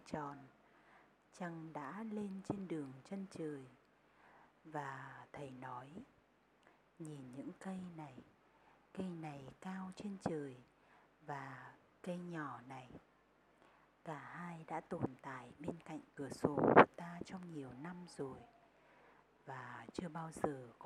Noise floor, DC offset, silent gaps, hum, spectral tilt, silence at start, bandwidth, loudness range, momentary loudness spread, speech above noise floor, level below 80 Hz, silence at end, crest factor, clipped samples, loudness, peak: -73 dBFS; under 0.1%; none; none; -6.5 dB/octave; 0.05 s; 13 kHz; 16 LU; 12 LU; 30 dB; -76 dBFS; 0 s; 34 dB; under 0.1%; -43 LUFS; -10 dBFS